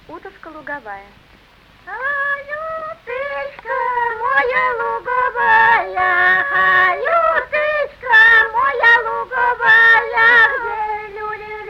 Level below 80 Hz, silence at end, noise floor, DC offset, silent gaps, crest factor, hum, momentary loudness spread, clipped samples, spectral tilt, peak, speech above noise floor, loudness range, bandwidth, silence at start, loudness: -50 dBFS; 0 s; -48 dBFS; under 0.1%; none; 16 dB; none; 17 LU; under 0.1%; -3.5 dB/octave; -2 dBFS; 30 dB; 13 LU; 13 kHz; 0.1 s; -14 LUFS